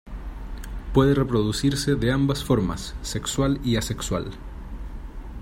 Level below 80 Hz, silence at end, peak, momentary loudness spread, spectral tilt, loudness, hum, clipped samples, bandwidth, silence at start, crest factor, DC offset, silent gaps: -36 dBFS; 0 s; -4 dBFS; 18 LU; -5.5 dB/octave; -24 LUFS; none; under 0.1%; 16 kHz; 0.05 s; 20 dB; under 0.1%; none